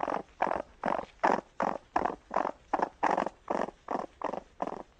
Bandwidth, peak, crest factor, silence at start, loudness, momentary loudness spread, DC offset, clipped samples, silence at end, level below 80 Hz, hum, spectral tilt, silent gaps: 9.6 kHz; -12 dBFS; 22 dB; 0 s; -33 LUFS; 8 LU; under 0.1%; under 0.1%; 0.15 s; -62 dBFS; none; -5.5 dB/octave; none